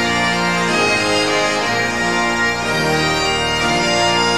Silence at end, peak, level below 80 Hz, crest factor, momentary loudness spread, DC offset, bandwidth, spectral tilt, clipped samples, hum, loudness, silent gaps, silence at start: 0 s; -4 dBFS; -40 dBFS; 12 dB; 2 LU; 0.9%; 16 kHz; -3 dB/octave; under 0.1%; none; -15 LUFS; none; 0 s